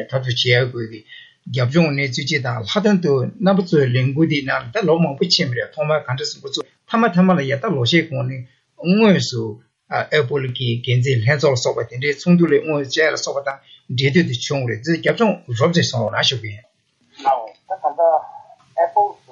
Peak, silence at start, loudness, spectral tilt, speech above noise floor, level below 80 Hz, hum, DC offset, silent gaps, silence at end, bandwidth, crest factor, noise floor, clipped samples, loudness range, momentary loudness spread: -2 dBFS; 0 s; -18 LUFS; -5.5 dB/octave; 39 dB; -62 dBFS; none; under 0.1%; none; 0.2 s; 7.8 kHz; 16 dB; -57 dBFS; under 0.1%; 2 LU; 11 LU